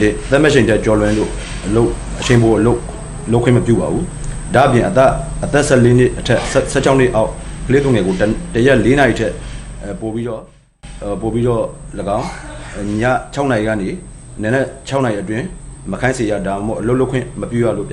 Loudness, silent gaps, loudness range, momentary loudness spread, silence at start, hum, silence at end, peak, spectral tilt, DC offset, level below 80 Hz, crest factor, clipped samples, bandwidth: -15 LUFS; none; 6 LU; 15 LU; 0 s; none; 0 s; 0 dBFS; -6 dB/octave; under 0.1%; -30 dBFS; 14 dB; under 0.1%; 11.5 kHz